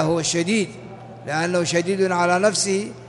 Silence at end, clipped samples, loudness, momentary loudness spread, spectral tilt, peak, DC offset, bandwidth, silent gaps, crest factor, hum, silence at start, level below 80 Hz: 0 s; under 0.1%; -21 LUFS; 14 LU; -4 dB/octave; -6 dBFS; under 0.1%; 11.5 kHz; none; 16 dB; none; 0 s; -58 dBFS